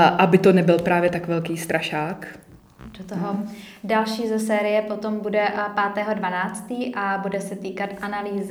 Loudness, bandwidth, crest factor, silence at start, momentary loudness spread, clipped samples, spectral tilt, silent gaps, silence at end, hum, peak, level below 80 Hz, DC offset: -22 LUFS; 19 kHz; 20 dB; 0 s; 14 LU; under 0.1%; -6 dB/octave; none; 0 s; none; -2 dBFS; -58 dBFS; under 0.1%